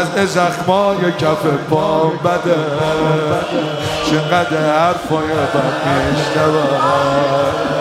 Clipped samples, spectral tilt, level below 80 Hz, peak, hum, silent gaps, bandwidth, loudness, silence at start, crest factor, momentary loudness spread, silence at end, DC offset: under 0.1%; -5.5 dB/octave; -44 dBFS; 0 dBFS; none; none; 16 kHz; -15 LUFS; 0 s; 14 dB; 3 LU; 0 s; under 0.1%